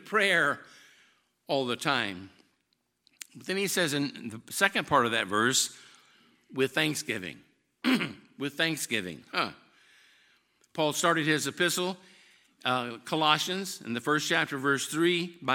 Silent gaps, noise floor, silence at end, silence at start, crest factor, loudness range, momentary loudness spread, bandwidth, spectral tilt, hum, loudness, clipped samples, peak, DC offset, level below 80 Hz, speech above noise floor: none; -76 dBFS; 0 s; 0.05 s; 24 dB; 4 LU; 12 LU; 17 kHz; -3 dB/octave; none; -28 LUFS; under 0.1%; -6 dBFS; under 0.1%; -74 dBFS; 47 dB